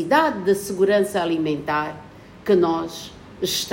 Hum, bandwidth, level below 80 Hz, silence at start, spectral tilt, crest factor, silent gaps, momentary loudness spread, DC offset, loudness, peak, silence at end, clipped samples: none; 16.5 kHz; -56 dBFS; 0 s; -4.5 dB/octave; 18 dB; none; 13 LU; under 0.1%; -21 LUFS; -4 dBFS; 0 s; under 0.1%